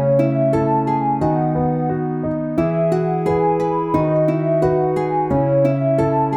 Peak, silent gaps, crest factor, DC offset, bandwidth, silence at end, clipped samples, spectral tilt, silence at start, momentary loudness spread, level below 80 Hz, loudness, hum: -2 dBFS; none; 14 dB; under 0.1%; 9.8 kHz; 0 s; under 0.1%; -10 dB/octave; 0 s; 4 LU; -44 dBFS; -18 LUFS; none